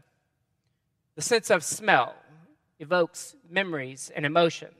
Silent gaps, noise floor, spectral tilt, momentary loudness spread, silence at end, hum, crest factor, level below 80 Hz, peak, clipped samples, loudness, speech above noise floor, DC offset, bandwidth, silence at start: none; -75 dBFS; -3 dB/octave; 11 LU; 0.15 s; none; 26 dB; -78 dBFS; -2 dBFS; under 0.1%; -26 LUFS; 49 dB; under 0.1%; 15 kHz; 1.15 s